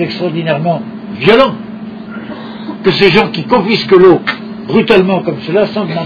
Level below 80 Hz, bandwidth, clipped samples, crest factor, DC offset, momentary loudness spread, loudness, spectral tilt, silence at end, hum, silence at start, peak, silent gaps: -44 dBFS; 5.4 kHz; 0.7%; 12 dB; under 0.1%; 17 LU; -11 LUFS; -7.5 dB/octave; 0 s; none; 0 s; 0 dBFS; none